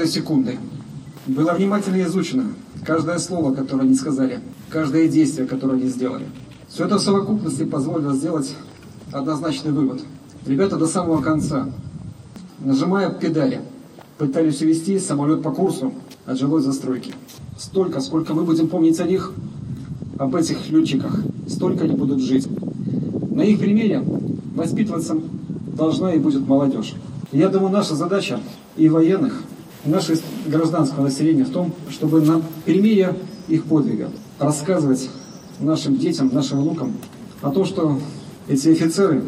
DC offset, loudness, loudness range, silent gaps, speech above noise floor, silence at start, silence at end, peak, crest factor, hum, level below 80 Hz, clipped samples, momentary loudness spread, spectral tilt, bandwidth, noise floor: under 0.1%; -20 LUFS; 3 LU; none; 22 dB; 0 s; 0 s; -4 dBFS; 16 dB; none; -56 dBFS; under 0.1%; 15 LU; -6.5 dB/octave; 14.5 kHz; -41 dBFS